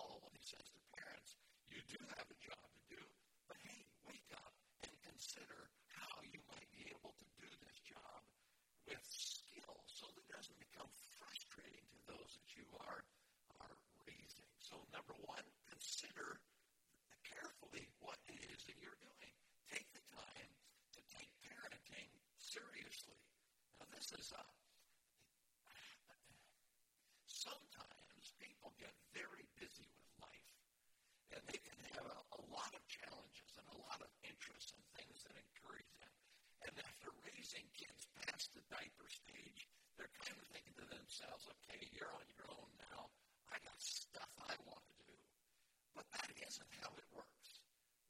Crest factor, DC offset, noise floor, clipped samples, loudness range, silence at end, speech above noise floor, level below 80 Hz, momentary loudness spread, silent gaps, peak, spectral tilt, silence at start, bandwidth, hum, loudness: 26 dB; under 0.1%; -81 dBFS; under 0.1%; 5 LU; 0 s; 24 dB; -84 dBFS; 13 LU; none; -34 dBFS; -1 dB/octave; 0 s; 16.5 kHz; none; -57 LUFS